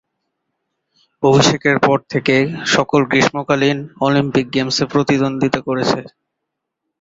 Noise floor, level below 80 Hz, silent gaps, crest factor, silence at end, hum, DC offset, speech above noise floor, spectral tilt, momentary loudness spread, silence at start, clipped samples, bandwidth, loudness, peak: -78 dBFS; -50 dBFS; none; 16 dB; 0.95 s; none; under 0.1%; 62 dB; -5 dB/octave; 5 LU; 1.2 s; under 0.1%; 7.8 kHz; -16 LUFS; 0 dBFS